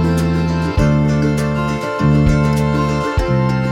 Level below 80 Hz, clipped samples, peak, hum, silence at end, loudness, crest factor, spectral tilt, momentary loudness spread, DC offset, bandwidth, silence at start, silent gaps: -26 dBFS; under 0.1%; -2 dBFS; none; 0 s; -16 LUFS; 14 dB; -7.5 dB/octave; 4 LU; under 0.1%; 13 kHz; 0 s; none